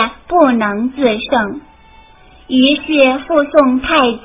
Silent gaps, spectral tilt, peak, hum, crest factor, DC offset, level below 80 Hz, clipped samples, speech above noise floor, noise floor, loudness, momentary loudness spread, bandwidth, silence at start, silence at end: none; -8.5 dB/octave; 0 dBFS; none; 14 dB; under 0.1%; -42 dBFS; 0.2%; 30 dB; -43 dBFS; -13 LUFS; 6 LU; 4 kHz; 0 s; 0.05 s